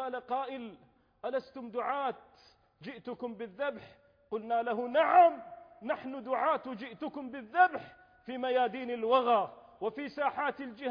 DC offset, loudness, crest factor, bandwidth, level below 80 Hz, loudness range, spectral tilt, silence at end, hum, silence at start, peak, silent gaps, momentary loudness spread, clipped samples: under 0.1%; -32 LUFS; 20 dB; 5.2 kHz; -76 dBFS; 9 LU; -6.5 dB/octave; 0 s; none; 0 s; -12 dBFS; none; 18 LU; under 0.1%